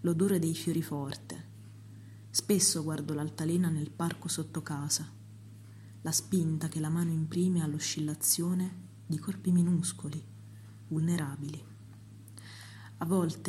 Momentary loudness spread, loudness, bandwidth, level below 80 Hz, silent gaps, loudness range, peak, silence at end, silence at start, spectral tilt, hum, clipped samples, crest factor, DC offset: 23 LU; -32 LUFS; 15.5 kHz; -72 dBFS; none; 4 LU; -14 dBFS; 0 s; 0 s; -5 dB/octave; none; under 0.1%; 20 dB; under 0.1%